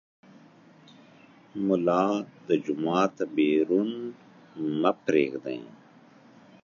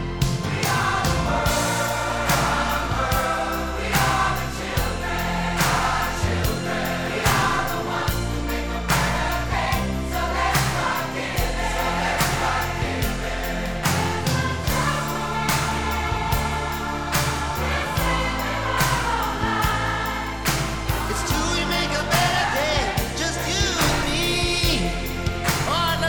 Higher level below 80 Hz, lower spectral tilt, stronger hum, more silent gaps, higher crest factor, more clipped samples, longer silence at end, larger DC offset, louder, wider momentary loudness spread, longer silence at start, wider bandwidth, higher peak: second, -76 dBFS vs -32 dBFS; first, -6.5 dB/octave vs -4 dB/octave; neither; neither; first, 22 dB vs 16 dB; neither; first, 0.95 s vs 0 s; neither; second, -27 LUFS vs -23 LUFS; first, 13 LU vs 5 LU; first, 1.55 s vs 0 s; second, 7.2 kHz vs 19.5 kHz; about the same, -6 dBFS vs -6 dBFS